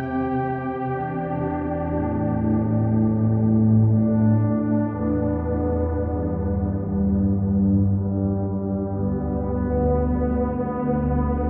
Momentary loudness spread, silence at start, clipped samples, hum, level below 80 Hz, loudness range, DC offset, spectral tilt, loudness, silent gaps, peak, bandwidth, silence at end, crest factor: 6 LU; 0 s; under 0.1%; none; -34 dBFS; 3 LU; under 0.1%; -11.5 dB/octave; -22 LUFS; none; -8 dBFS; 3.3 kHz; 0 s; 12 dB